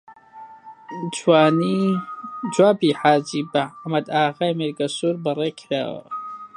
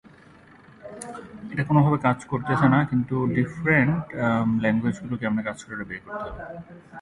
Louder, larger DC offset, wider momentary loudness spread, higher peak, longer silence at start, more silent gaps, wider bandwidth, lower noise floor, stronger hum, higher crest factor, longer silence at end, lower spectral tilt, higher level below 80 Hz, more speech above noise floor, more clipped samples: first, -21 LUFS vs -24 LUFS; neither; second, 15 LU vs 18 LU; first, -2 dBFS vs -6 dBFS; second, 0.1 s vs 0.8 s; neither; about the same, 11 kHz vs 11.5 kHz; second, -43 dBFS vs -51 dBFS; neither; about the same, 20 dB vs 18 dB; about the same, 0.1 s vs 0 s; second, -5.5 dB/octave vs -8 dB/octave; second, -70 dBFS vs -52 dBFS; second, 23 dB vs 27 dB; neither